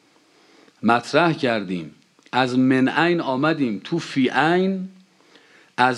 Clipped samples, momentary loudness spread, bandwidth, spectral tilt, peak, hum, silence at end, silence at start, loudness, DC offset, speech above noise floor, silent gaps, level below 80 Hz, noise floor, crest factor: under 0.1%; 12 LU; 10.5 kHz; -6 dB/octave; -2 dBFS; none; 0 s; 0.8 s; -21 LUFS; under 0.1%; 36 dB; none; -72 dBFS; -56 dBFS; 20 dB